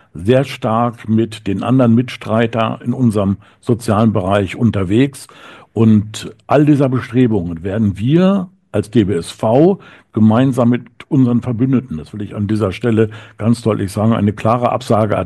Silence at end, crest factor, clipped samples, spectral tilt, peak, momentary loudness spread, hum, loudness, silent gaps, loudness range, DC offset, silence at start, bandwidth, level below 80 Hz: 0 s; 14 dB; under 0.1%; -8 dB/octave; 0 dBFS; 9 LU; none; -15 LUFS; none; 2 LU; under 0.1%; 0.15 s; 12.5 kHz; -48 dBFS